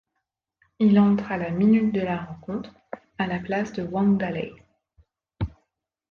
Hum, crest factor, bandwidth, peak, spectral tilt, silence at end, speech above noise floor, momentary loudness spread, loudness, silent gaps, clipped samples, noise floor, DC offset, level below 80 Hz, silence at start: none; 16 dB; 6.6 kHz; -10 dBFS; -8.5 dB/octave; 0.65 s; 58 dB; 15 LU; -24 LUFS; none; under 0.1%; -81 dBFS; under 0.1%; -50 dBFS; 0.8 s